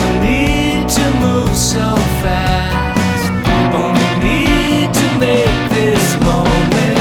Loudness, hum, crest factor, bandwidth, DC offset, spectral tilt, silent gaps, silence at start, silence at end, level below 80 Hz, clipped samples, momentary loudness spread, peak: -13 LUFS; none; 12 dB; 20 kHz; under 0.1%; -5 dB/octave; none; 0 s; 0 s; -22 dBFS; under 0.1%; 3 LU; -2 dBFS